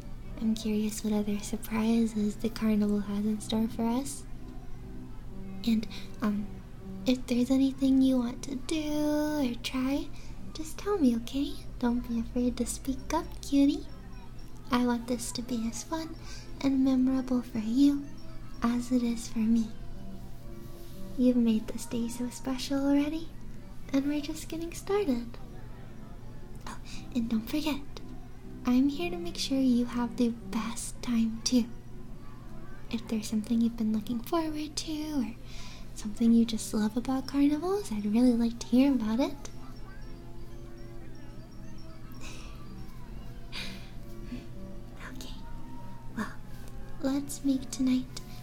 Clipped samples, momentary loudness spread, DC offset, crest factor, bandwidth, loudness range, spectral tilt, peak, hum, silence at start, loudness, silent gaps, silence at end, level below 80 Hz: under 0.1%; 21 LU; under 0.1%; 18 dB; 17.5 kHz; 13 LU; -5 dB/octave; -12 dBFS; none; 0 s; -30 LUFS; none; 0 s; -44 dBFS